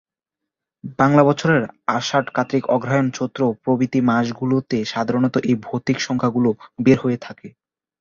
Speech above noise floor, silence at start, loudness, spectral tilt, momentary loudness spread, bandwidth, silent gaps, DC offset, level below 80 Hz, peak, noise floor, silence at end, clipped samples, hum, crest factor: 65 dB; 0.85 s; -19 LUFS; -6.5 dB/octave; 7 LU; 7.4 kHz; none; under 0.1%; -56 dBFS; -2 dBFS; -84 dBFS; 0.5 s; under 0.1%; none; 18 dB